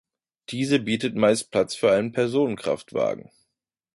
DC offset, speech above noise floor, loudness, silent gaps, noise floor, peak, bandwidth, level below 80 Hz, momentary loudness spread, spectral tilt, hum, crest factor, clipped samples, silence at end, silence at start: under 0.1%; 57 dB; -23 LUFS; none; -80 dBFS; -8 dBFS; 11.5 kHz; -62 dBFS; 7 LU; -5 dB/octave; none; 18 dB; under 0.1%; 0.8 s; 0.5 s